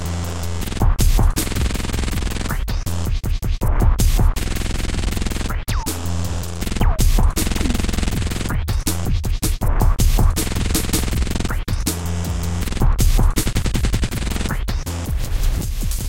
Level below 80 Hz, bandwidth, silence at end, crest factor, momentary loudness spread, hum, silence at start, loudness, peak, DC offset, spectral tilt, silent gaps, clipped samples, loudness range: -20 dBFS; 17 kHz; 0 s; 14 dB; 7 LU; none; 0 s; -22 LUFS; -4 dBFS; under 0.1%; -4.5 dB/octave; none; under 0.1%; 1 LU